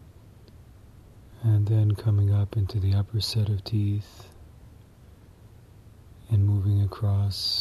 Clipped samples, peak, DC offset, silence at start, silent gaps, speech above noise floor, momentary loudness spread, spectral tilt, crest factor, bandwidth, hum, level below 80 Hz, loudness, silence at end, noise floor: under 0.1%; -14 dBFS; under 0.1%; 0.55 s; none; 27 dB; 5 LU; -6.5 dB/octave; 12 dB; 12.5 kHz; none; -50 dBFS; -25 LUFS; 0 s; -51 dBFS